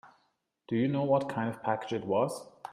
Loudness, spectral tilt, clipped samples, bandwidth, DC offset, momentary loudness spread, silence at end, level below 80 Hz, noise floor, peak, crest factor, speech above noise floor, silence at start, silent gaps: -31 LUFS; -7 dB/octave; under 0.1%; 14.5 kHz; under 0.1%; 6 LU; 0 s; -72 dBFS; -75 dBFS; -14 dBFS; 18 dB; 45 dB; 0.05 s; none